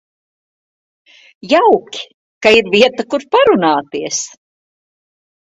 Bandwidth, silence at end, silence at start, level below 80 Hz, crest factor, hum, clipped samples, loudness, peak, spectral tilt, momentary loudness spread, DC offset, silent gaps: 8 kHz; 1.15 s; 1.45 s; -56 dBFS; 16 dB; none; under 0.1%; -13 LUFS; 0 dBFS; -3 dB/octave; 18 LU; under 0.1%; 2.14-2.41 s